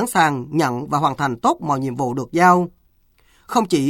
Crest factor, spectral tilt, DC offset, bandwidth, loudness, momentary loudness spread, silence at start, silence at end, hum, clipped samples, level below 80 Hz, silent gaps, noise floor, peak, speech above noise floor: 16 dB; -5.5 dB/octave; under 0.1%; 17 kHz; -19 LUFS; 8 LU; 0 s; 0 s; none; under 0.1%; -56 dBFS; none; -58 dBFS; -2 dBFS; 40 dB